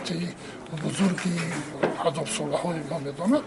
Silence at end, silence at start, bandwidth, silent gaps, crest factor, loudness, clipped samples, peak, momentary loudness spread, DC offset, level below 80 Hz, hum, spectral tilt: 0 s; 0 s; 11.5 kHz; none; 20 dB; -28 LUFS; under 0.1%; -8 dBFS; 8 LU; under 0.1%; -60 dBFS; none; -5 dB/octave